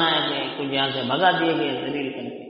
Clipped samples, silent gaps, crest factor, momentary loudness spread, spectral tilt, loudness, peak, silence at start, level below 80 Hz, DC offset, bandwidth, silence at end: under 0.1%; none; 16 dB; 9 LU; -1.5 dB/octave; -23 LUFS; -6 dBFS; 0 s; -66 dBFS; under 0.1%; 5.6 kHz; 0 s